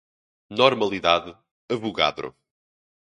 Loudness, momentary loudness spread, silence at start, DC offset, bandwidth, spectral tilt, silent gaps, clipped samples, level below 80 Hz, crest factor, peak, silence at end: -22 LUFS; 17 LU; 0.5 s; under 0.1%; 10 kHz; -4.5 dB/octave; 1.51-1.68 s; under 0.1%; -58 dBFS; 24 dB; 0 dBFS; 0.8 s